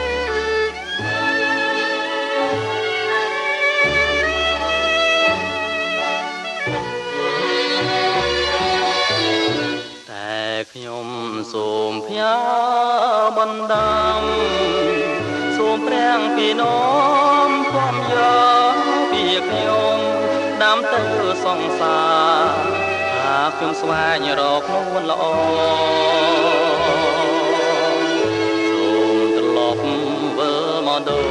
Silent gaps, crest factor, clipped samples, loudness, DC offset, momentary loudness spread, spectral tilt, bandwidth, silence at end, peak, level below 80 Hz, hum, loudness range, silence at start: none; 16 dB; under 0.1%; -18 LUFS; under 0.1%; 7 LU; -4 dB/octave; 11 kHz; 0 s; -2 dBFS; -46 dBFS; none; 4 LU; 0 s